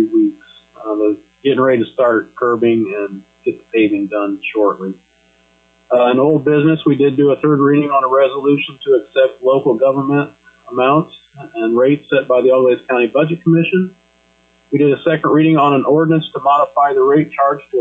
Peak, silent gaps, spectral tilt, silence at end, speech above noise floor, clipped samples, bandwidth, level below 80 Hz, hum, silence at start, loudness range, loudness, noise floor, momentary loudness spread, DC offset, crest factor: -2 dBFS; none; -9 dB/octave; 0 s; 40 dB; under 0.1%; 4 kHz; -60 dBFS; none; 0 s; 4 LU; -14 LUFS; -54 dBFS; 9 LU; under 0.1%; 12 dB